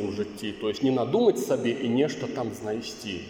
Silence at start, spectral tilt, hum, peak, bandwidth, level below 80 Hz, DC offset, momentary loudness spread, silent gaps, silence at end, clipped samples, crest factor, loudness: 0 s; -5.5 dB/octave; none; -10 dBFS; 17 kHz; -64 dBFS; under 0.1%; 10 LU; none; 0 s; under 0.1%; 18 dB; -27 LUFS